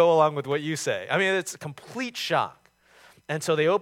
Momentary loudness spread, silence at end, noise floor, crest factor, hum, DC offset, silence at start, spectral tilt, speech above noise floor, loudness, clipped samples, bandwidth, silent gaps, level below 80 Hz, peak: 13 LU; 0 s; -56 dBFS; 18 dB; none; under 0.1%; 0 s; -4 dB/octave; 32 dB; -26 LUFS; under 0.1%; 16.5 kHz; none; -74 dBFS; -8 dBFS